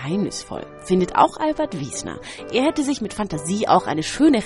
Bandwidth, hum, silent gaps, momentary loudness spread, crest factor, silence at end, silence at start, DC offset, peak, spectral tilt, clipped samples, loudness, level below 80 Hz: 11.5 kHz; none; none; 13 LU; 20 dB; 0 s; 0 s; under 0.1%; -2 dBFS; -5 dB/octave; under 0.1%; -21 LUFS; -48 dBFS